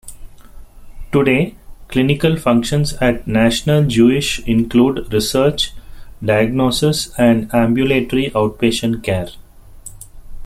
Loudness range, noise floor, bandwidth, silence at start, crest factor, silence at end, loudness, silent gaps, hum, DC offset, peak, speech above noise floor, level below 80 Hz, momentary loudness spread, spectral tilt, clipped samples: 2 LU; -37 dBFS; 15.5 kHz; 0.05 s; 14 dB; 0 s; -16 LUFS; none; none; under 0.1%; -2 dBFS; 22 dB; -34 dBFS; 8 LU; -5.5 dB/octave; under 0.1%